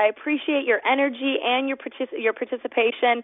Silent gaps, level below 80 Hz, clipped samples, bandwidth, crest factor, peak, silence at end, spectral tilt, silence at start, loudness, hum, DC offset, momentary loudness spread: none; -74 dBFS; under 0.1%; 3.9 kHz; 18 dB; -6 dBFS; 0 s; -7.5 dB/octave; 0 s; -23 LUFS; none; under 0.1%; 8 LU